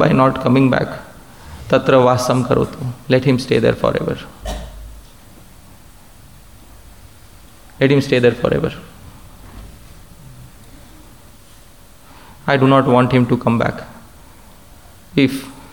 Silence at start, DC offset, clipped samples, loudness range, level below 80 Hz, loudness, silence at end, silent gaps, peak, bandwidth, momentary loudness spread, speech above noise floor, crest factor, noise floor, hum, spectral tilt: 0 s; 0.5%; under 0.1%; 11 LU; -40 dBFS; -16 LUFS; 0.2 s; none; 0 dBFS; 19 kHz; 21 LU; 30 dB; 18 dB; -44 dBFS; none; -7 dB/octave